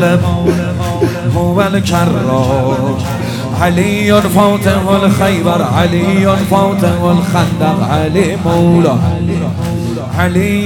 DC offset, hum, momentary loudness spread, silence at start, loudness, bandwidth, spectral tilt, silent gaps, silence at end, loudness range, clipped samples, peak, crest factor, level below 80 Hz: under 0.1%; none; 6 LU; 0 s; -12 LUFS; 17.5 kHz; -6.5 dB/octave; none; 0 s; 2 LU; under 0.1%; 0 dBFS; 12 dB; -34 dBFS